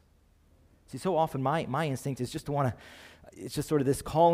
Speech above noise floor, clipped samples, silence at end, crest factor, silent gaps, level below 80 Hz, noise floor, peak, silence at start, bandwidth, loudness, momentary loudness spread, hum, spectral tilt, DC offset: 34 dB; under 0.1%; 0 s; 18 dB; none; -56 dBFS; -63 dBFS; -12 dBFS; 0.9 s; 16 kHz; -30 LUFS; 18 LU; none; -6 dB/octave; under 0.1%